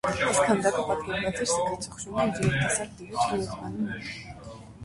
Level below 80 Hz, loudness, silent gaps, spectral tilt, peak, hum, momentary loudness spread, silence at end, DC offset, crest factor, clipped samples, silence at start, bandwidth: -50 dBFS; -27 LUFS; none; -4 dB/octave; -10 dBFS; none; 14 LU; 0 s; under 0.1%; 18 dB; under 0.1%; 0.05 s; 11.5 kHz